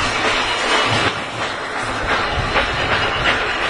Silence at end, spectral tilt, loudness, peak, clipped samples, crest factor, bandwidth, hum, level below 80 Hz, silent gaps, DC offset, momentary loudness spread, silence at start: 0 s; -3 dB/octave; -18 LUFS; -2 dBFS; under 0.1%; 16 dB; 11 kHz; none; -34 dBFS; none; under 0.1%; 7 LU; 0 s